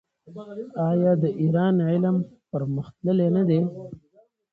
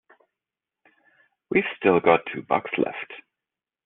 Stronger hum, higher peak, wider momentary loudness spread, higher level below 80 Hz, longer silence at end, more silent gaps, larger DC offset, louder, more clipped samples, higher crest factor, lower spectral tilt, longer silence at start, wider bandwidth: neither; second, -10 dBFS vs -4 dBFS; about the same, 17 LU vs 17 LU; about the same, -62 dBFS vs -66 dBFS; about the same, 0.55 s vs 0.65 s; neither; neither; about the same, -23 LUFS vs -23 LUFS; neither; second, 14 dB vs 22 dB; first, -11 dB/octave vs -4 dB/octave; second, 0.25 s vs 1.5 s; about the same, 4.4 kHz vs 4.1 kHz